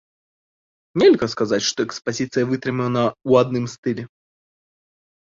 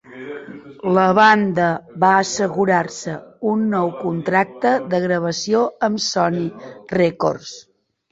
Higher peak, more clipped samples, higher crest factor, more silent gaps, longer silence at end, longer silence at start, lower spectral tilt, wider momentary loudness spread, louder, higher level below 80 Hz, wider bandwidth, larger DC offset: about the same, -2 dBFS vs -2 dBFS; neither; about the same, 18 dB vs 18 dB; first, 3.78-3.83 s vs none; first, 1.15 s vs 0.5 s; first, 0.95 s vs 0.1 s; about the same, -5 dB/octave vs -5 dB/octave; second, 11 LU vs 16 LU; about the same, -20 LUFS vs -18 LUFS; about the same, -60 dBFS vs -60 dBFS; about the same, 7.6 kHz vs 8 kHz; neither